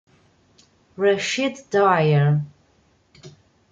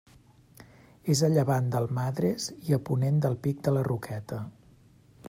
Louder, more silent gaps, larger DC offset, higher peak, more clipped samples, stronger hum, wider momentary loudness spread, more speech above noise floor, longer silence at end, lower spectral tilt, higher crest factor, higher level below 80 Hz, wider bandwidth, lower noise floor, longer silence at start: first, -20 LUFS vs -28 LUFS; neither; neither; first, -4 dBFS vs -10 dBFS; neither; neither; second, 7 LU vs 13 LU; first, 41 dB vs 31 dB; first, 0.4 s vs 0 s; about the same, -6 dB/octave vs -6.5 dB/octave; about the same, 18 dB vs 18 dB; about the same, -64 dBFS vs -62 dBFS; second, 7.8 kHz vs 16 kHz; about the same, -60 dBFS vs -57 dBFS; first, 1 s vs 0.6 s